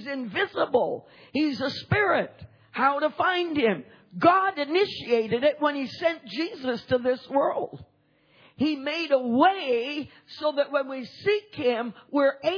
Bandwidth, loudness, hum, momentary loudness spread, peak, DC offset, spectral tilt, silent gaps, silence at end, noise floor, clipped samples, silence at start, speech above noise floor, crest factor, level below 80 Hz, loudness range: 5.4 kHz; -26 LUFS; none; 10 LU; -6 dBFS; under 0.1%; -6.5 dB/octave; none; 0 s; -62 dBFS; under 0.1%; 0 s; 37 dB; 20 dB; -64 dBFS; 3 LU